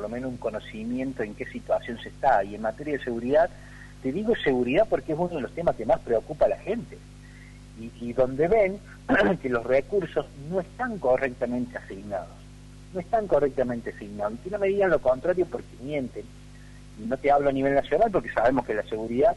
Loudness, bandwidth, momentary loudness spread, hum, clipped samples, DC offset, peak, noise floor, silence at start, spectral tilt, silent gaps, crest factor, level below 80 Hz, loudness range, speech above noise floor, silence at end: -26 LUFS; 11.5 kHz; 15 LU; 50 Hz at -45 dBFS; under 0.1%; under 0.1%; -10 dBFS; -46 dBFS; 0 s; -7 dB/octave; none; 16 dB; -48 dBFS; 3 LU; 20 dB; 0 s